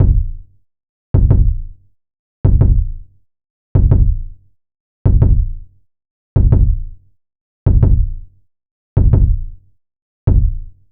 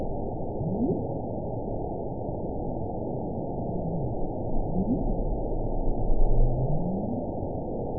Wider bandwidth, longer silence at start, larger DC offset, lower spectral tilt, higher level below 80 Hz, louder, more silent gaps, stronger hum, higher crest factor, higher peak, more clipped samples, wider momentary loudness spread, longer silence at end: first, 2 kHz vs 1 kHz; about the same, 0 s vs 0 s; second, under 0.1% vs 1%; second, -14.5 dB/octave vs -18 dB/octave; first, -16 dBFS vs -30 dBFS; first, -16 LUFS vs -31 LUFS; first, 0.89-1.14 s, 2.19-2.44 s, 3.50-3.75 s, 4.80-5.05 s, 6.11-6.36 s, 7.41-7.66 s, 8.71-8.96 s, 10.02-10.27 s vs none; neither; about the same, 14 dB vs 16 dB; first, 0 dBFS vs -10 dBFS; neither; first, 15 LU vs 5 LU; first, 0.25 s vs 0 s